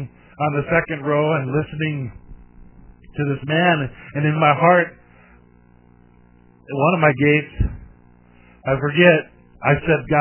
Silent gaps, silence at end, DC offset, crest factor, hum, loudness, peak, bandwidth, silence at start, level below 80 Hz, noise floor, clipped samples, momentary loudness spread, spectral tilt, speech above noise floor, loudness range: none; 0 s; under 0.1%; 20 dB; 60 Hz at -50 dBFS; -19 LUFS; 0 dBFS; 3.2 kHz; 0 s; -38 dBFS; -51 dBFS; under 0.1%; 13 LU; -10.5 dB/octave; 33 dB; 4 LU